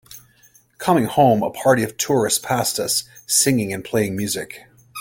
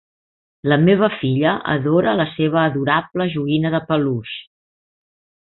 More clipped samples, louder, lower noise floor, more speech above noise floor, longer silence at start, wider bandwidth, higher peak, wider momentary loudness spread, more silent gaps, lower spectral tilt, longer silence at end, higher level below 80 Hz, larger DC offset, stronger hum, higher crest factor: neither; about the same, -19 LUFS vs -18 LUFS; second, -54 dBFS vs under -90 dBFS; second, 35 dB vs over 72 dB; second, 0.1 s vs 0.65 s; first, 17 kHz vs 4.2 kHz; about the same, -2 dBFS vs -2 dBFS; about the same, 10 LU vs 8 LU; neither; second, -3.5 dB/octave vs -12 dB/octave; second, 0 s vs 1.15 s; about the same, -56 dBFS vs -56 dBFS; neither; neither; about the same, 18 dB vs 16 dB